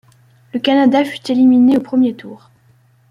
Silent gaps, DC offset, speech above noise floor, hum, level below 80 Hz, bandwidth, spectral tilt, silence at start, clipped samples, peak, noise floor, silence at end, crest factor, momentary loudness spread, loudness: none; under 0.1%; 39 dB; none; -60 dBFS; 11 kHz; -6 dB/octave; 0.55 s; under 0.1%; -2 dBFS; -52 dBFS; 0.75 s; 14 dB; 10 LU; -13 LUFS